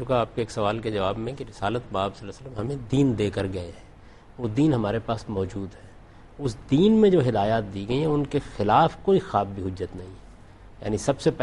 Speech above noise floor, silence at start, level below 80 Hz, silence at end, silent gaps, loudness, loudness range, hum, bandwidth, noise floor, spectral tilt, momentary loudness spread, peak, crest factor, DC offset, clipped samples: 24 dB; 0 s; -48 dBFS; 0 s; none; -25 LUFS; 6 LU; none; 11.5 kHz; -48 dBFS; -7 dB/octave; 15 LU; -6 dBFS; 18 dB; under 0.1%; under 0.1%